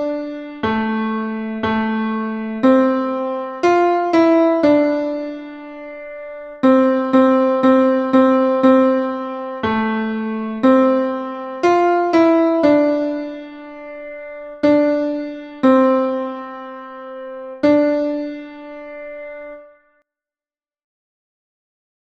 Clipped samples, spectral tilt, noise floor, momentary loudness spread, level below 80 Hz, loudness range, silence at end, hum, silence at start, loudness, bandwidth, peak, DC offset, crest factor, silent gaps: under 0.1%; -7 dB/octave; under -90 dBFS; 19 LU; -56 dBFS; 7 LU; 2.35 s; none; 0 s; -16 LUFS; 7.2 kHz; -2 dBFS; under 0.1%; 16 dB; none